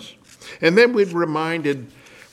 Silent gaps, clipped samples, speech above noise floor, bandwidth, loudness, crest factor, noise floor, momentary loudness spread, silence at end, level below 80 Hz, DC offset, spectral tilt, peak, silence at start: none; under 0.1%; 24 dB; 13 kHz; -19 LUFS; 18 dB; -42 dBFS; 13 LU; 0.45 s; -66 dBFS; under 0.1%; -5.5 dB/octave; -2 dBFS; 0 s